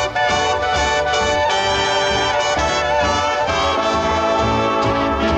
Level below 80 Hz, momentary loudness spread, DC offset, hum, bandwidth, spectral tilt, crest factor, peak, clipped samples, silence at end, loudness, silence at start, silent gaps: -34 dBFS; 1 LU; under 0.1%; none; 9 kHz; -3.5 dB/octave; 10 dB; -8 dBFS; under 0.1%; 0 s; -17 LUFS; 0 s; none